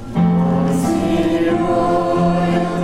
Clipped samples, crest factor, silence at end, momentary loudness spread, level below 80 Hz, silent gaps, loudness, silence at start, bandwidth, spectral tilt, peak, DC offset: under 0.1%; 10 dB; 0 s; 1 LU; -38 dBFS; none; -16 LUFS; 0 s; 13 kHz; -7.5 dB/octave; -6 dBFS; under 0.1%